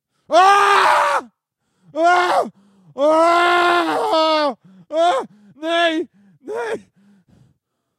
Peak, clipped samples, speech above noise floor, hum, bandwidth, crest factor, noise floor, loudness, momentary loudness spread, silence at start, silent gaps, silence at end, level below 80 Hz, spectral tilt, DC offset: -2 dBFS; under 0.1%; 55 dB; none; 14.5 kHz; 16 dB; -71 dBFS; -16 LUFS; 17 LU; 0.3 s; none; 1.2 s; -74 dBFS; -2.5 dB/octave; under 0.1%